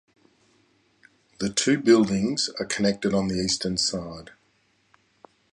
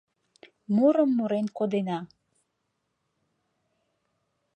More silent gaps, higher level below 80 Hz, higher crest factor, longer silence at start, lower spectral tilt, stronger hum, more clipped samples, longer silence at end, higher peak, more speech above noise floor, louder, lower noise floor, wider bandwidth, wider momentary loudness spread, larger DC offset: neither; first, -54 dBFS vs -80 dBFS; about the same, 20 dB vs 18 dB; first, 1.4 s vs 0.7 s; second, -4 dB/octave vs -8.5 dB/octave; neither; neither; second, 1.25 s vs 2.5 s; first, -6 dBFS vs -10 dBFS; second, 43 dB vs 54 dB; first, -23 LUFS vs -26 LUFS; second, -66 dBFS vs -78 dBFS; first, 11.5 kHz vs 8.6 kHz; first, 13 LU vs 10 LU; neither